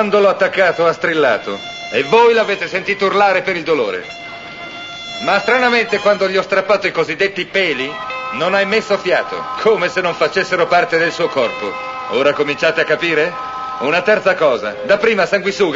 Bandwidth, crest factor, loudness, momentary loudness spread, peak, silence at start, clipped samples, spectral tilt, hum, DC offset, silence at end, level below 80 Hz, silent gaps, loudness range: 8 kHz; 16 dB; -15 LUFS; 11 LU; 0 dBFS; 0 s; under 0.1%; -4 dB/octave; none; under 0.1%; 0 s; -56 dBFS; none; 2 LU